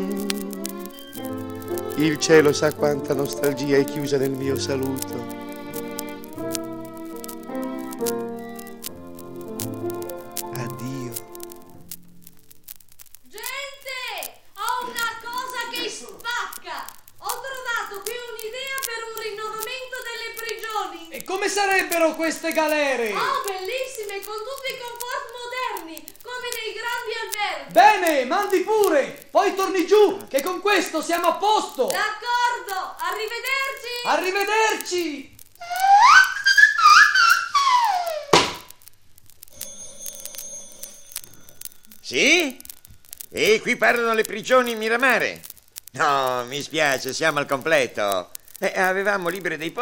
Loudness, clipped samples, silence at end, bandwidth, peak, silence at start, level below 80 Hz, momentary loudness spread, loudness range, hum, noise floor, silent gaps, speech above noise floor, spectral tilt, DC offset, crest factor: -21 LUFS; under 0.1%; 0 s; 17 kHz; 0 dBFS; 0 s; -60 dBFS; 19 LU; 15 LU; none; -47 dBFS; none; 25 dB; -3 dB/octave; 0.1%; 22 dB